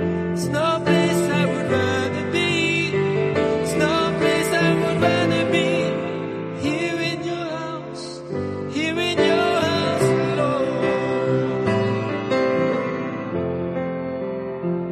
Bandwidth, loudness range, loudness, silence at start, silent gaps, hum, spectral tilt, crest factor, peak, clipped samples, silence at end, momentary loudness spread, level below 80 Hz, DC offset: 13 kHz; 4 LU; -21 LUFS; 0 s; none; none; -5.5 dB/octave; 16 dB; -4 dBFS; under 0.1%; 0 s; 9 LU; -54 dBFS; under 0.1%